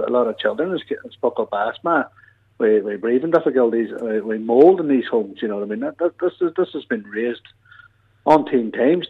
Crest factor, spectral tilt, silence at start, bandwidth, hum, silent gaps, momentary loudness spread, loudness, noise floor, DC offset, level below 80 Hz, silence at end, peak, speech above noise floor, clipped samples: 18 dB; -7.5 dB/octave; 0 s; 5.8 kHz; none; none; 10 LU; -20 LUFS; -51 dBFS; under 0.1%; -66 dBFS; 0 s; -2 dBFS; 32 dB; under 0.1%